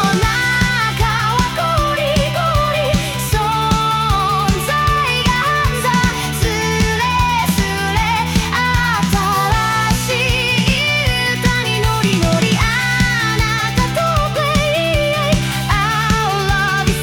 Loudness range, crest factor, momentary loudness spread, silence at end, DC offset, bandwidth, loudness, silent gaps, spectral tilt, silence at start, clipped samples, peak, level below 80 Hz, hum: 1 LU; 12 dB; 2 LU; 0 s; under 0.1%; 18 kHz; -15 LUFS; none; -4.5 dB/octave; 0 s; under 0.1%; -4 dBFS; -26 dBFS; none